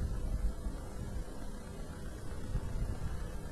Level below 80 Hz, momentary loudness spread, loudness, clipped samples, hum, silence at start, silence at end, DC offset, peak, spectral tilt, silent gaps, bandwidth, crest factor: -40 dBFS; 7 LU; -43 LUFS; under 0.1%; none; 0 s; 0 s; under 0.1%; -22 dBFS; -6.5 dB/octave; none; 13.5 kHz; 14 dB